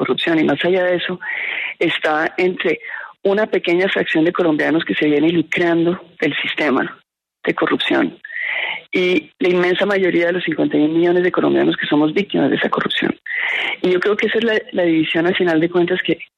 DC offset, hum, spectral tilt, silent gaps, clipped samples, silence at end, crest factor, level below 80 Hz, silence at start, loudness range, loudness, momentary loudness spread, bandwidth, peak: under 0.1%; none; -6.5 dB/octave; none; under 0.1%; 0.15 s; 14 dB; -62 dBFS; 0 s; 3 LU; -17 LUFS; 5 LU; 7.8 kHz; -4 dBFS